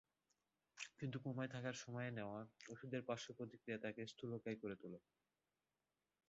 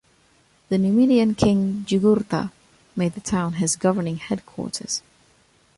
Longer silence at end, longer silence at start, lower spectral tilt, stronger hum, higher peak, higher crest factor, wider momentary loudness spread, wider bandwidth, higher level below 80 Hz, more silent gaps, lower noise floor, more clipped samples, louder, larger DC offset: first, 1.3 s vs 0.8 s; about the same, 0.75 s vs 0.7 s; about the same, -5.5 dB/octave vs -5.5 dB/octave; neither; second, -30 dBFS vs -4 dBFS; about the same, 20 dB vs 18 dB; about the same, 9 LU vs 11 LU; second, 7.6 kHz vs 11.5 kHz; second, -84 dBFS vs -52 dBFS; neither; first, under -90 dBFS vs -59 dBFS; neither; second, -50 LUFS vs -22 LUFS; neither